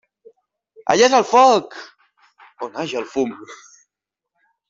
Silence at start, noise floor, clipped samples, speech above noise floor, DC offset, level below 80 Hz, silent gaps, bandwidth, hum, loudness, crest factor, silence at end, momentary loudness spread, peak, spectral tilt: 0.85 s; -84 dBFS; under 0.1%; 67 dB; under 0.1%; -64 dBFS; none; 7.8 kHz; none; -17 LUFS; 18 dB; 1.15 s; 24 LU; -2 dBFS; -3 dB/octave